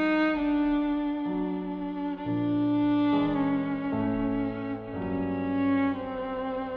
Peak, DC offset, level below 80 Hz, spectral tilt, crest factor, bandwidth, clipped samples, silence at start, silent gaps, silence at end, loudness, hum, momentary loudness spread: -14 dBFS; under 0.1%; -50 dBFS; -9 dB/octave; 14 dB; 4.9 kHz; under 0.1%; 0 s; none; 0 s; -28 LUFS; none; 8 LU